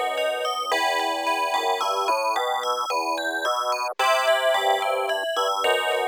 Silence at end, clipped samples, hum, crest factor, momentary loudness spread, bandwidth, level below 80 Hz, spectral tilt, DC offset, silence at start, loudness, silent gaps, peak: 0 s; under 0.1%; none; 14 dB; 4 LU; over 20 kHz; -74 dBFS; 1 dB/octave; under 0.1%; 0 s; -23 LUFS; none; -10 dBFS